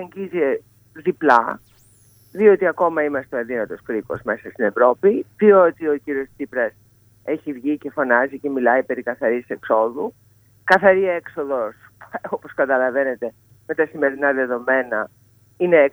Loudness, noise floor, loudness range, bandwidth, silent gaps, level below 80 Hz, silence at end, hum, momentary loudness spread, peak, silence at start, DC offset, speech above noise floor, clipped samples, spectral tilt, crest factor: -20 LUFS; -53 dBFS; 3 LU; over 20 kHz; none; -64 dBFS; 0 s; none; 14 LU; 0 dBFS; 0 s; under 0.1%; 34 dB; under 0.1%; -7 dB/octave; 20 dB